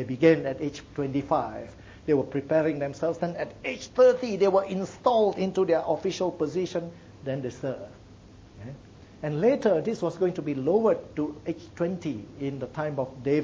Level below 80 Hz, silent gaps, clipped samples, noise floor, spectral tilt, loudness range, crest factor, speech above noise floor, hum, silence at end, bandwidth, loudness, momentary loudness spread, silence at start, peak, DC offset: -58 dBFS; none; under 0.1%; -50 dBFS; -7 dB/octave; 6 LU; 20 dB; 23 dB; none; 0 s; 7.6 kHz; -27 LUFS; 14 LU; 0 s; -8 dBFS; under 0.1%